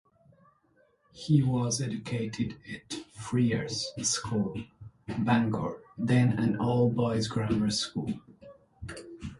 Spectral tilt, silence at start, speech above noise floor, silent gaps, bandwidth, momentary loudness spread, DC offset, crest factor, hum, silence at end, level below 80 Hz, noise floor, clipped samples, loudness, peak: -5.5 dB/octave; 1.15 s; 39 dB; none; 11.5 kHz; 17 LU; under 0.1%; 18 dB; none; 0.05 s; -56 dBFS; -67 dBFS; under 0.1%; -29 LUFS; -12 dBFS